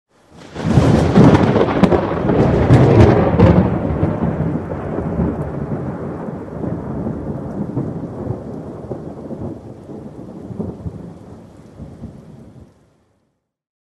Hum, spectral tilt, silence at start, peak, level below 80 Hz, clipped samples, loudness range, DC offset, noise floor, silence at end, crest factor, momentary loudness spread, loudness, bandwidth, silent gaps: none; -8.5 dB/octave; 0.4 s; 0 dBFS; -32 dBFS; under 0.1%; 20 LU; under 0.1%; -68 dBFS; 1.25 s; 18 dB; 23 LU; -16 LUFS; 10.5 kHz; none